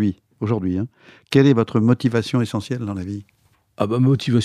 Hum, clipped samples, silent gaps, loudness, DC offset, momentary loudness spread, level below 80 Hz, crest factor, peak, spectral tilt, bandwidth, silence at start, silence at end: none; under 0.1%; none; -20 LUFS; under 0.1%; 13 LU; -56 dBFS; 18 dB; -2 dBFS; -7.5 dB/octave; 12.5 kHz; 0 s; 0 s